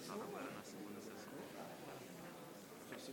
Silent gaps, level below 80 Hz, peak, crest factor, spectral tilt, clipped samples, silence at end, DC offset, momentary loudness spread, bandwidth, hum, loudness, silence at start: none; -84 dBFS; -34 dBFS; 18 dB; -4 dB/octave; under 0.1%; 0 s; under 0.1%; 6 LU; 17.5 kHz; none; -52 LUFS; 0 s